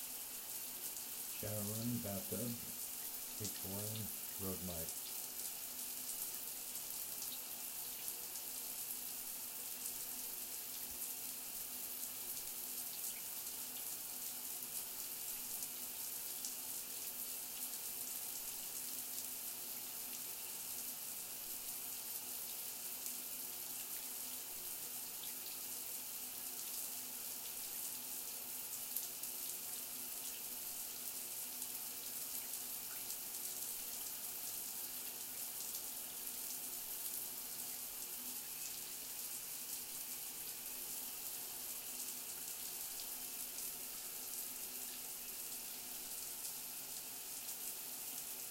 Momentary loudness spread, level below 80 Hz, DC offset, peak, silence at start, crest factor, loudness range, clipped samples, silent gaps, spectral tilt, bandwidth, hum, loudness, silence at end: 2 LU; -76 dBFS; under 0.1%; -18 dBFS; 0 s; 28 dB; 1 LU; under 0.1%; none; -1.5 dB/octave; 17 kHz; none; -43 LUFS; 0 s